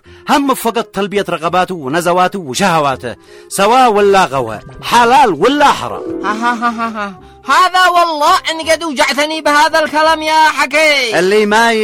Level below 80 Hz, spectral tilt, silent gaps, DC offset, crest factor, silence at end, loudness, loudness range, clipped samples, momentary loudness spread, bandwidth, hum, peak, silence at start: -46 dBFS; -3.5 dB/octave; none; under 0.1%; 12 dB; 0 s; -11 LUFS; 3 LU; under 0.1%; 10 LU; 16.5 kHz; none; 0 dBFS; 0.1 s